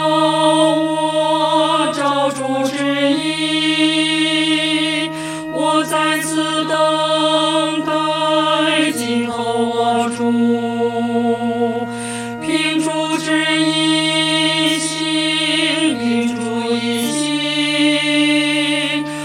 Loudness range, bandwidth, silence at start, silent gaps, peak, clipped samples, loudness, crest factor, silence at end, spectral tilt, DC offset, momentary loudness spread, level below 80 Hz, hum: 3 LU; 15.5 kHz; 0 s; none; -2 dBFS; under 0.1%; -16 LUFS; 14 dB; 0 s; -3.5 dB/octave; under 0.1%; 5 LU; -60 dBFS; none